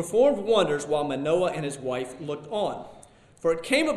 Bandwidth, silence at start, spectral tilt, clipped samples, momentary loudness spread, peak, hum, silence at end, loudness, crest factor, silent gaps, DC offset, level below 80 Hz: 13 kHz; 0 s; -4.5 dB/octave; under 0.1%; 11 LU; -8 dBFS; none; 0 s; -26 LUFS; 18 dB; none; under 0.1%; -60 dBFS